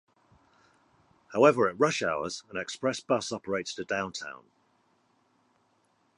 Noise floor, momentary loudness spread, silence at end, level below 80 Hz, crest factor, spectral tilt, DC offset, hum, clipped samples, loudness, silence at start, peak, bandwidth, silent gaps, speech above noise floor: -70 dBFS; 14 LU; 1.85 s; -68 dBFS; 24 dB; -4 dB/octave; under 0.1%; none; under 0.1%; -29 LUFS; 1.3 s; -6 dBFS; 11 kHz; none; 42 dB